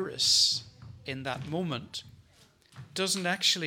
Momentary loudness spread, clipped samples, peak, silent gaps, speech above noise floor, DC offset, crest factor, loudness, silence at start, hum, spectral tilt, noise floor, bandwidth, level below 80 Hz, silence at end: 19 LU; under 0.1%; -12 dBFS; none; 32 dB; under 0.1%; 20 dB; -27 LUFS; 0 s; none; -2 dB/octave; -62 dBFS; 19 kHz; -66 dBFS; 0 s